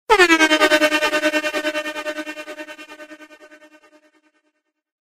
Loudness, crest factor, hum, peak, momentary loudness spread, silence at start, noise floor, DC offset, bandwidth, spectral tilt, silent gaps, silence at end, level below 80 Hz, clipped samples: -17 LUFS; 18 dB; none; -2 dBFS; 23 LU; 0.1 s; -71 dBFS; under 0.1%; 16 kHz; -1 dB/octave; none; 1.85 s; -54 dBFS; under 0.1%